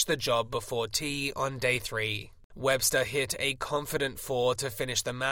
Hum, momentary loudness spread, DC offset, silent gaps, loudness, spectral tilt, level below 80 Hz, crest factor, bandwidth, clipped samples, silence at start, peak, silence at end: none; 6 LU; under 0.1%; 2.44-2.50 s; -29 LUFS; -2.5 dB/octave; -54 dBFS; 18 dB; 17 kHz; under 0.1%; 0 s; -12 dBFS; 0 s